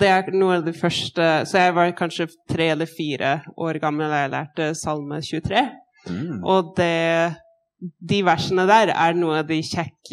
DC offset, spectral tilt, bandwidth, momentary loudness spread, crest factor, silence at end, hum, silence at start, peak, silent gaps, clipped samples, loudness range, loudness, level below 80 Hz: under 0.1%; -5 dB/octave; 13.5 kHz; 10 LU; 18 dB; 0.05 s; none; 0 s; -2 dBFS; none; under 0.1%; 4 LU; -21 LUFS; -56 dBFS